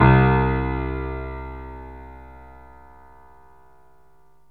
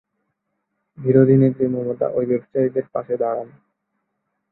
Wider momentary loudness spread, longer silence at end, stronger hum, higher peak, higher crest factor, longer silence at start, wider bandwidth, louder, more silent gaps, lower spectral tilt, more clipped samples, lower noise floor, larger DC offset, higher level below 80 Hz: first, 28 LU vs 12 LU; first, 2.1 s vs 1.05 s; first, 50 Hz at -65 dBFS vs none; about the same, -2 dBFS vs -2 dBFS; about the same, 20 dB vs 18 dB; second, 0 s vs 1 s; first, 4.5 kHz vs 4 kHz; second, -22 LUFS vs -19 LUFS; neither; second, -10.5 dB/octave vs -13.5 dB/octave; neither; second, -59 dBFS vs -75 dBFS; first, 0.3% vs under 0.1%; first, -32 dBFS vs -60 dBFS